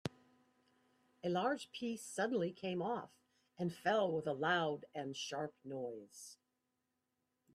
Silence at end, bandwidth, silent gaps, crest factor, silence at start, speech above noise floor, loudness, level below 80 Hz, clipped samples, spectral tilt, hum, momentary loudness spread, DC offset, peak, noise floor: 1.2 s; 14 kHz; none; 22 dB; 0.05 s; 47 dB; -40 LUFS; -82 dBFS; under 0.1%; -5 dB/octave; none; 13 LU; under 0.1%; -20 dBFS; -87 dBFS